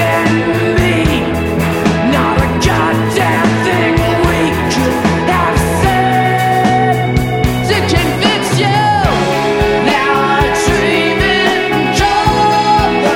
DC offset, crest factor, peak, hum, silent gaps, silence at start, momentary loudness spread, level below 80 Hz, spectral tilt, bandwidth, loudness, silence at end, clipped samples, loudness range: under 0.1%; 12 dB; 0 dBFS; none; none; 0 s; 2 LU; -26 dBFS; -5.5 dB/octave; 17.5 kHz; -12 LUFS; 0 s; under 0.1%; 1 LU